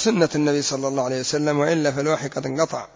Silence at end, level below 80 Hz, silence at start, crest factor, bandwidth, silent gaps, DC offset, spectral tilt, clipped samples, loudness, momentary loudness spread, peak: 0.1 s; -60 dBFS; 0 s; 16 dB; 7.8 kHz; none; under 0.1%; -4.5 dB/octave; under 0.1%; -22 LUFS; 4 LU; -6 dBFS